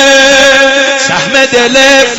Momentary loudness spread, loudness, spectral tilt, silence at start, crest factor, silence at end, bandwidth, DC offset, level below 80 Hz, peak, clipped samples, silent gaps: 5 LU; -5 LUFS; -1 dB/octave; 0 s; 6 dB; 0 s; 18 kHz; under 0.1%; -38 dBFS; 0 dBFS; 3%; none